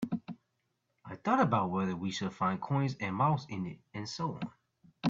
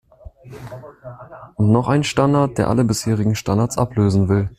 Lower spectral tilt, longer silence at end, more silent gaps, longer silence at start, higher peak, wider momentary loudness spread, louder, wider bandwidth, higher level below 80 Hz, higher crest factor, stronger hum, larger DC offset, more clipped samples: about the same, -6.5 dB/octave vs -6.5 dB/octave; about the same, 0 s vs 0.05 s; neither; second, 0 s vs 0.25 s; second, -14 dBFS vs -2 dBFS; second, 14 LU vs 21 LU; second, -33 LUFS vs -18 LUFS; second, 7.8 kHz vs 14.5 kHz; second, -70 dBFS vs -44 dBFS; about the same, 20 dB vs 16 dB; neither; neither; neither